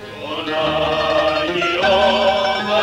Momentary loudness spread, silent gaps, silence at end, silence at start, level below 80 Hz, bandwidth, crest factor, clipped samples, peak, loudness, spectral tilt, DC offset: 7 LU; none; 0 s; 0 s; -42 dBFS; 12.5 kHz; 14 dB; under 0.1%; -4 dBFS; -17 LUFS; -4 dB/octave; under 0.1%